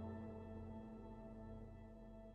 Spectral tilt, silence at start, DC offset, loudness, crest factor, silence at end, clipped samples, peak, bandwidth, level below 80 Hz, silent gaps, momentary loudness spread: -9.5 dB/octave; 0 s; under 0.1%; -55 LUFS; 14 dB; 0 s; under 0.1%; -38 dBFS; 8.8 kHz; -62 dBFS; none; 7 LU